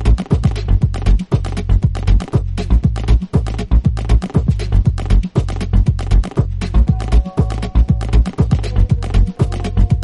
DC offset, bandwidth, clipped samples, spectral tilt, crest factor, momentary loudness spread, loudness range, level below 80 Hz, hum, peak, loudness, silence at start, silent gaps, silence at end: under 0.1%; 10.5 kHz; under 0.1%; -8 dB/octave; 12 dB; 3 LU; 0 LU; -16 dBFS; none; -2 dBFS; -17 LUFS; 0 s; none; 0 s